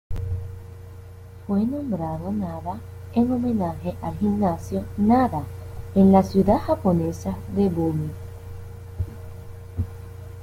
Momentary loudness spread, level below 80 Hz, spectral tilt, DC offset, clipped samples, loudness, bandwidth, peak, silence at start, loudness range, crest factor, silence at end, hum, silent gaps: 20 LU; -44 dBFS; -9 dB/octave; under 0.1%; under 0.1%; -23 LUFS; 15.5 kHz; -4 dBFS; 0.1 s; 7 LU; 20 dB; 0 s; none; none